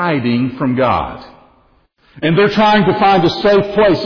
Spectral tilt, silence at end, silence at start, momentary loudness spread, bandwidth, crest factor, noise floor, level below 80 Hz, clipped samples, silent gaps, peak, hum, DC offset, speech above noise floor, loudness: -7.5 dB/octave; 0 s; 0 s; 8 LU; 5.4 kHz; 10 dB; -54 dBFS; -42 dBFS; under 0.1%; none; -4 dBFS; none; under 0.1%; 41 dB; -13 LUFS